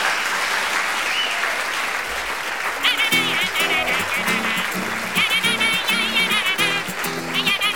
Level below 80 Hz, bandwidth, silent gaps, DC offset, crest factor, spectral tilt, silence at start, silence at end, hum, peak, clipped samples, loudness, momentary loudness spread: -54 dBFS; over 20 kHz; none; 0.6%; 16 dB; -1.5 dB/octave; 0 s; 0 s; none; -4 dBFS; under 0.1%; -19 LUFS; 7 LU